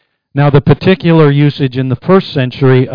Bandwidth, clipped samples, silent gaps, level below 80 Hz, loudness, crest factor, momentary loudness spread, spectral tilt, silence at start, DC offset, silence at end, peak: 5.2 kHz; under 0.1%; none; -38 dBFS; -10 LUFS; 10 dB; 7 LU; -10 dB/octave; 0.35 s; under 0.1%; 0 s; 0 dBFS